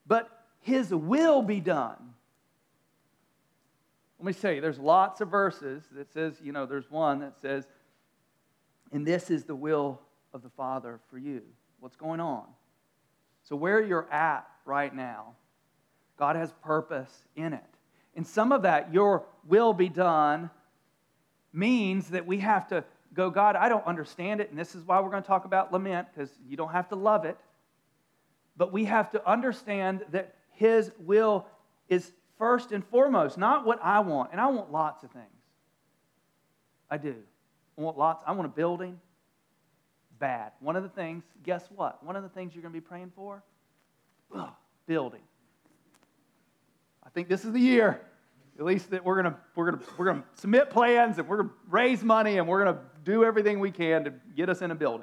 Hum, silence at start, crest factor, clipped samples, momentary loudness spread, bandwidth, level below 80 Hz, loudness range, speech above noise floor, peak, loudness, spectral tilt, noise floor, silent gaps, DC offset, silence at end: none; 0.1 s; 20 dB; under 0.1%; 17 LU; 12 kHz; under -90 dBFS; 12 LU; 44 dB; -8 dBFS; -28 LUFS; -7 dB/octave; -72 dBFS; none; under 0.1%; 0 s